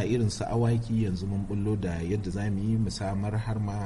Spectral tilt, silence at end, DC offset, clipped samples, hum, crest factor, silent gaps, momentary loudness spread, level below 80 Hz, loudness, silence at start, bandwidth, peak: -7 dB/octave; 0 s; under 0.1%; under 0.1%; none; 12 dB; none; 4 LU; -44 dBFS; -29 LUFS; 0 s; 11.5 kHz; -16 dBFS